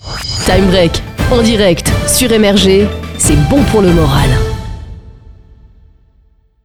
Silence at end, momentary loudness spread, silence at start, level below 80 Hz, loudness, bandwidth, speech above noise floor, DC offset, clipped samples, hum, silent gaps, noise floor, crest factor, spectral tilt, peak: 1.1 s; 10 LU; 0 s; -22 dBFS; -10 LUFS; over 20 kHz; 40 dB; under 0.1%; under 0.1%; none; none; -49 dBFS; 12 dB; -4.5 dB/octave; 0 dBFS